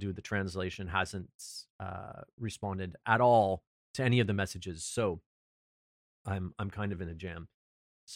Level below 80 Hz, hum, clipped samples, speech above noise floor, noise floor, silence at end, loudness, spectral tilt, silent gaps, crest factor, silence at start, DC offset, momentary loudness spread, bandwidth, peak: -58 dBFS; none; under 0.1%; over 57 dB; under -90 dBFS; 0 s; -33 LUFS; -5.5 dB/octave; 1.34-1.39 s, 1.70-1.79 s, 2.33-2.38 s, 3.67-3.94 s, 5.26-6.25 s, 7.54-8.07 s; 22 dB; 0 s; under 0.1%; 17 LU; 15 kHz; -12 dBFS